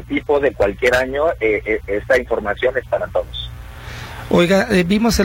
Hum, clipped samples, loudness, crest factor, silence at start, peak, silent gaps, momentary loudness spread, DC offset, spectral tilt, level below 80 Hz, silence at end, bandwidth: none; under 0.1%; -17 LUFS; 16 dB; 0 s; -2 dBFS; none; 16 LU; under 0.1%; -5.5 dB/octave; -34 dBFS; 0 s; 16.5 kHz